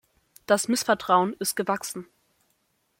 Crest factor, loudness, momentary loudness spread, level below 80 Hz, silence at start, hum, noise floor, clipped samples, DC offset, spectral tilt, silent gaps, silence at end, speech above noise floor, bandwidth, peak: 20 dB; -25 LUFS; 10 LU; -70 dBFS; 0.5 s; none; -71 dBFS; under 0.1%; under 0.1%; -3 dB/octave; none; 0.95 s; 47 dB; 16.5 kHz; -6 dBFS